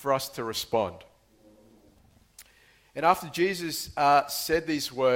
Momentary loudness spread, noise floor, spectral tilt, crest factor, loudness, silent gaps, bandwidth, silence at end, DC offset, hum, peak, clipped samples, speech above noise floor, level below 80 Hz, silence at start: 10 LU; -60 dBFS; -3.5 dB/octave; 22 dB; -27 LUFS; none; 17 kHz; 0 s; under 0.1%; none; -8 dBFS; under 0.1%; 34 dB; -60 dBFS; 0 s